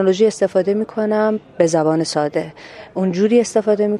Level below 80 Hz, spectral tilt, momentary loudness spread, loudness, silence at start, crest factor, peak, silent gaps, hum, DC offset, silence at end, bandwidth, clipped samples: -60 dBFS; -5.5 dB/octave; 9 LU; -17 LUFS; 0 s; 16 dB; -2 dBFS; none; none; under 0.1%; 0 s; 11.5 kHz; under 0.1%